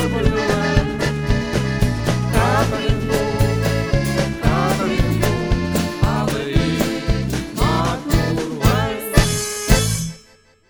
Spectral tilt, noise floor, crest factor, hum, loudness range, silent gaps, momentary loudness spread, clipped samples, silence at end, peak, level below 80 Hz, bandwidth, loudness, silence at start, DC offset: -5.5 dB/octave; -51 dBFS; 18 dB; none; 1 LU; none; 4 LU; under 0.1%; 0.5 s; 0 dBFS; -26 dBFS; over 20 kHz; -19 LUFS; 0 s; under 0.1%